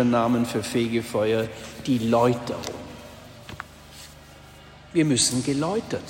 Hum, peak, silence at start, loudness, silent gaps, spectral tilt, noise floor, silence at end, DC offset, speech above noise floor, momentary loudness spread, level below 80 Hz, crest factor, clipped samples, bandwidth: none; -8 dBFS; 0 s; -24 LUFS; none; -4.5 dB/octave; -47 dBFS; 0 s; under 0.1%; 23 dB; 22 LU; -54 dBFS; 16 dB; under 0.1%; 16.5 kHz